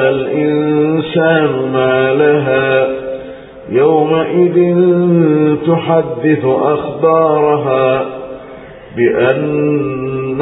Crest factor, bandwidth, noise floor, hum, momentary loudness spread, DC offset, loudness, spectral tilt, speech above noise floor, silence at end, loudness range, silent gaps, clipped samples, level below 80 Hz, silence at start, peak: 12 dB; 4 kHz; -32 dBFS; none; 12 LU; under 0.1%; -12 LUFS; -6 dB/octave; 21 dB; 0 s; 2 LU; none; under 0.1%; -50 dBFS; 0 s; 0 dBFS